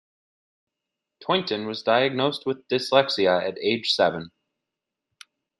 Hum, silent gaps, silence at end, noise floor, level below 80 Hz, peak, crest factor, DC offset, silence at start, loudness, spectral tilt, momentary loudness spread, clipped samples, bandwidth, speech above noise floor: none; none; 1.3 s; -85 dBFS; -70 dBFS; -2 dBFS; 22 dB; under 0.1%; 1.2 s; -23 LUFS; -4.5 dB/octave; 9 LU; under 0.1%; 12 kHz; 62 dB